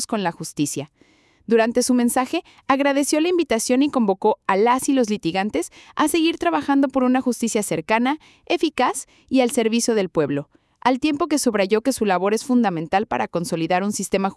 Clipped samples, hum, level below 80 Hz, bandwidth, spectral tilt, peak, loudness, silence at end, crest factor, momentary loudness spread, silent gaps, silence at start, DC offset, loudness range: under 0.1%; none; -58 dBFS; 12 kHz; -4 dB/octave; -2 dBFS; -20 LUFS; 0.05 s; 18 dB; 7 LU; none; 0 s; under 0.1%; 2 LU